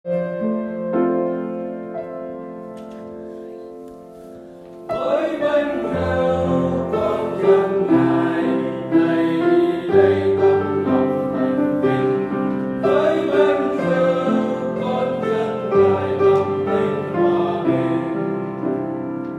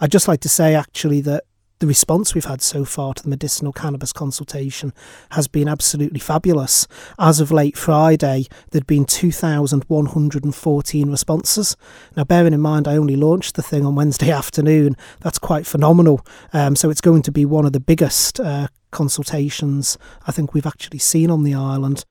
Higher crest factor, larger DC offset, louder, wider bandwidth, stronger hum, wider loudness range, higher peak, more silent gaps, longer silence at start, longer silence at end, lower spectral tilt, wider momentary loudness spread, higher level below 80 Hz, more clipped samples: about the same, 16 dB vs 16 dB; neither; about the same, -19 LUFS vs -17 LUFS; second, 8.4 kHz vs 18 kHz; neither; first, 9 LU vs 4 LU; about the same, -2 dBFS vs 0 dBFS; neither; about the same, 0.05 s vs 0 s; about the same, 0 s vs 0.1 s; first, -8 dB/octave vs -5 dB/octave; first, 17 LU vs 10 LU; second, -54 dBFS vs -42 dBFS; neither